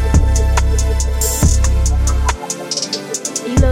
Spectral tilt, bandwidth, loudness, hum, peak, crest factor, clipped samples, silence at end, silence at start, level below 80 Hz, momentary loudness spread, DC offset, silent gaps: -4.5 dB/octave; 16.5 kHz; -16 LUFS; none; 0 dBFS; 14 dB; under 0.1%; 0 s; 0 s; -16 dBFS; 6 LU; under 0.1%; none